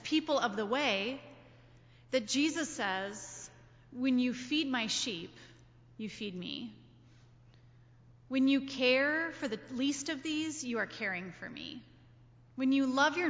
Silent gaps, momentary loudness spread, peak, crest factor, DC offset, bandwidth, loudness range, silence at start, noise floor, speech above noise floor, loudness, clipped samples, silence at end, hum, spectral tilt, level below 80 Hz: none; 16 LU; -16 dBFS; 18 dB; under 0.1%; 8 kHz; 5 LU; 0 s; -60 dBFS; 27 dB; -33 LUFS; under 0.1%; 0 s; none; -3 dB/octave; -70 dBFS